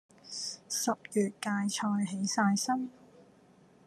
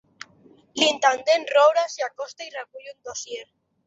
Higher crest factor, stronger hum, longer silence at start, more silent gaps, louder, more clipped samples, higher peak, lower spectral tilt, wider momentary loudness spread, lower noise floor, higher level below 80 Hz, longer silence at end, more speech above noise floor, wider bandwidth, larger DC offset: about the same, 18 dB vs 20 dB; neither; second, 0.25 s vs 0.75 s; neither; second, -32 LUFS vs -21 LUFS; neither; second, -16 dBFS vs -4 dBFS; first, -4 dB/octave vs -0.5 dB/octave; second, 10 LU vs 21 LU; first, -61 dBFS vs -55 dBFS; second, -82 dBFS vs -74 dBFS; first, 0.65 s vs 0.45 s; about the same, 30 dB vs 32 dB; first, 13.5 kHz vs 8 kHz; neither